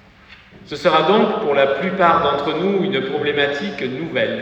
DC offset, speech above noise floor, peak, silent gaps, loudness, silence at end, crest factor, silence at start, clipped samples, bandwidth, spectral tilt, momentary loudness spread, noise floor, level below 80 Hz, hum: under 0.1%; 28 dB; -2 dBFS; none; -18 LUFS; 0 s; 16 dB; 0.3 s; under 0.1%; 8.4 kHz; -6 dB/octave; 8 LU; -45 dBFS; -52 dBFS; none